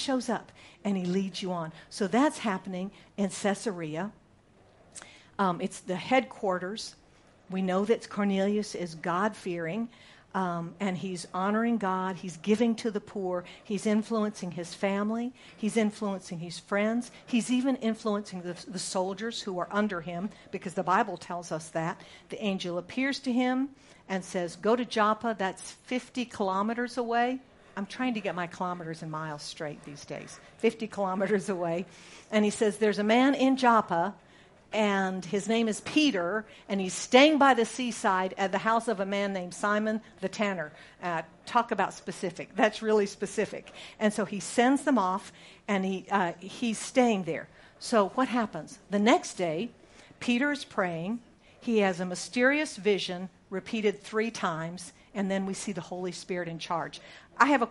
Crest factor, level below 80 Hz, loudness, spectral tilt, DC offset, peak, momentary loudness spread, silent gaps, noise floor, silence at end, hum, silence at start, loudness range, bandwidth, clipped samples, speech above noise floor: 24 dB; -68 dBFS; -30 LUFS; -5 dB/octave; under 0.1%; -4 dBFS; 13 LU; none; -60 dBFS; 0 s; none; 0 s; 6 LU; 11.5 kHz; under 0.1%; 31 dB